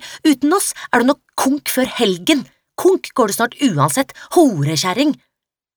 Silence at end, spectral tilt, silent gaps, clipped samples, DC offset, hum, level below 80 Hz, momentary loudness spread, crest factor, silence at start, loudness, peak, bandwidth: 0.6 s; -4 dB/octave; none; under 0.1%; under 0.1%; none; -58 dBFS; 4 LU; 16 dB; 0 s; -16 LUFS; -2 dBFS; over 20 kHz